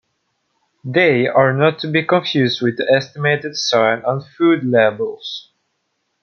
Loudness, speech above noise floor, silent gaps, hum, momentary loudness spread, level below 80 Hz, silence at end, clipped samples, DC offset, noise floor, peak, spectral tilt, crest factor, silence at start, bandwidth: -16 LUFS; 54 dB; none; none; 10 LU; -62 dBFS; 0.8 s; under 0.1%; under 0.1%; -70 dBFS; -2 dBFS; -5.5 dB/octave; 16 dB; 0.85 s; 7 kHz